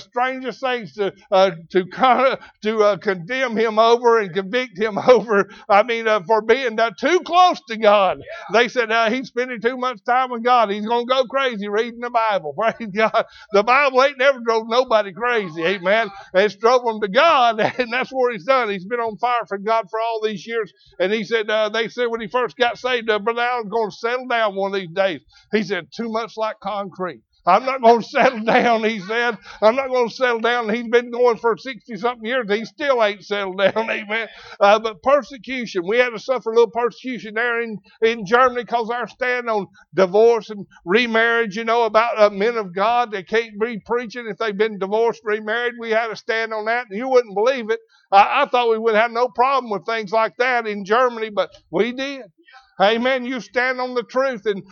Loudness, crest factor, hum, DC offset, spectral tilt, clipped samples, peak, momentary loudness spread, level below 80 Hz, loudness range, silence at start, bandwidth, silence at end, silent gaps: -19 LUFS; 18 dB; none; under 0.1%; -4.5 dB/octave; under 0.1%; 0 dBFS; 9 LU; -64 dBFS; 4 LU; 0 s; 7 kHz; 0.1 s; none